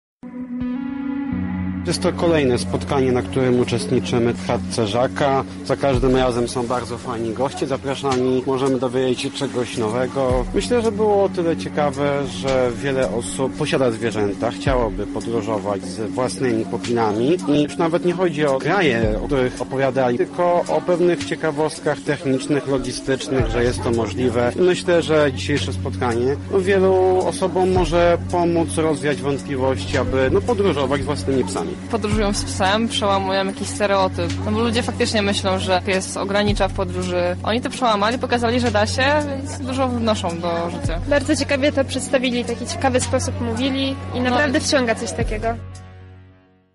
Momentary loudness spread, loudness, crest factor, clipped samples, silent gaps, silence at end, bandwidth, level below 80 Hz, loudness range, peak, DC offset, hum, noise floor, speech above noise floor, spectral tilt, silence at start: 6 LU; -20 LUFS; 14 dB; under 0.1%; none; 0.5 s; 11.5 kHz; -38 dBFS; 3 LU; -6 dBFS; under 0.1%; none; -51 dBFS; 31 dB; -5.5 dB/octave; 0.25 s